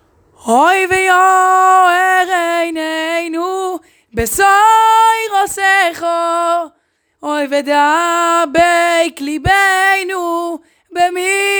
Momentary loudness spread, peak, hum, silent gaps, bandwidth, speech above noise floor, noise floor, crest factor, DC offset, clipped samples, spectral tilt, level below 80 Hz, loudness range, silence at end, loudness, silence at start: 11 LU; 0 dBFS; none; none; over 20 kHz; 49 dB; -61 dBFS; 12 dB; under 0.1%; under 0.1%; -2.5 dB/octave; -42 dBFS; 2 LU; 0 s; -12 LUFS; 0.45 s